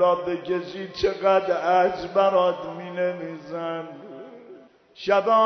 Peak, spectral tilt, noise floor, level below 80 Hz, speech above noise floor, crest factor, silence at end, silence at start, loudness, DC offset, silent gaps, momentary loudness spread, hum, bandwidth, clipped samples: -8 dBFS; -6 dB/octave; -48 dBFS; -58 dBFS; 26 dB; 16 dB; 0 s; 0 s; -24 LUFS; under 0.1%; none; 16 LU; none; 6.4 kHz; under 0.1%